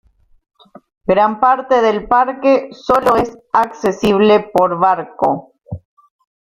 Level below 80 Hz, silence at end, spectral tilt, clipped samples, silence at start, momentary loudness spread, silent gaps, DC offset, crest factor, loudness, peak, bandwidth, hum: -46 dBFS; 0.75 s; -6 dB/octave; under 0.1%; 1.1 s; 12 LU; none; under 0.1%; 14 dB; -14 LUFS; -2 dBFS; 16 kHz; none